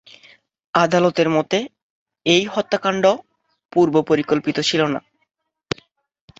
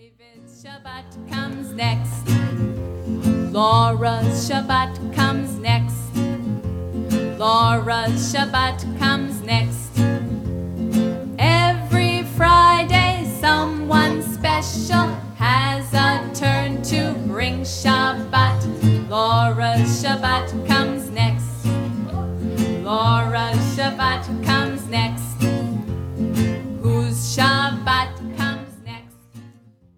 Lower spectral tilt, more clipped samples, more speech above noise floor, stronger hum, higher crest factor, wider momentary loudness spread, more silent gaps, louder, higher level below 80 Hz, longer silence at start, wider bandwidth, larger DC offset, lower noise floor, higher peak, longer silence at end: about the same, -5 dB/octave vs -5.5 dB/octave; neither; first, 46 dB vs 30 dB; neither; about the same, 18 dB vs 18 dB; first, 13 LU vs 9 LU; first, 1.82-2.06 s vs none; about the same, -19 LUFS vs -20 LUFS; second, -60 dBFS vs -40 dBFS; first, 0.75 s vs 0.45 s; second, 8 kHz vs 16.5 kHz; neither; first, -63 dBFS vs -49 dBFS; about the same, -2 dBFS vs -2 dBFS; first, 1.4 s vs 0.5 s